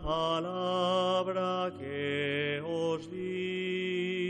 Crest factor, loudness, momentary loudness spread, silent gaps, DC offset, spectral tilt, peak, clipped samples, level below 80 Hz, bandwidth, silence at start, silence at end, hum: 14 dB; -32 LUFS; 7 LU; none; under 0.1%; -5.5 dB/octave; -18 dBFS; under 0.1%; -56 dBFS; 9 kHz; 0 s; 0 s; none